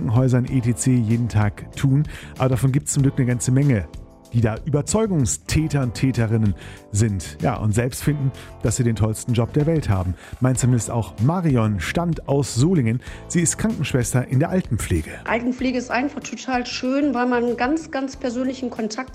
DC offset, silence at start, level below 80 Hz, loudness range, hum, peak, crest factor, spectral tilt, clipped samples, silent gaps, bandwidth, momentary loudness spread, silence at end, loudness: under 0.1%; 0 s; -40 dBFS; 2 LU; none; -6 dBFS; 14 dB; -6 dB/octave; under 0.1%; none; 15 kHz; 6 LU; 0 s; -21 LUFS